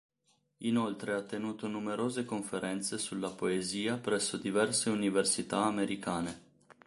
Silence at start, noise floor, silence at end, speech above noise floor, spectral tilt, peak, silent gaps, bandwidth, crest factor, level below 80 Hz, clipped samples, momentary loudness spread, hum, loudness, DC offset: 0.6 s; -75 dBFS; 0.5 s; 41 dB; -3.5 dB/octave; -16 dBFS; none; 11.5 kHz; 18 dB; -70 dBFS; under 0.1%; 8 LU; none; -33 LUFS; under 0.1%